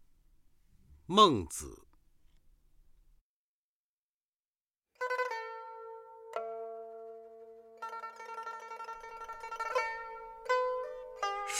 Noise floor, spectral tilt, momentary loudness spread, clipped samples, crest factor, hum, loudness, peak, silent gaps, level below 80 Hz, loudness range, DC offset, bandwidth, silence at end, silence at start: under -90 dBFS; -3.5 dB/octave; 20 LU; under 0.1%; 28 dB; none; -34 LUFS; -10 dBFS; 3.21-4.54 s, 4.61-4.71 s, 4.78-4.82 s; -64 dBFS; 12 LU; under 0.1%; 16 kHz; 0 s; 0 s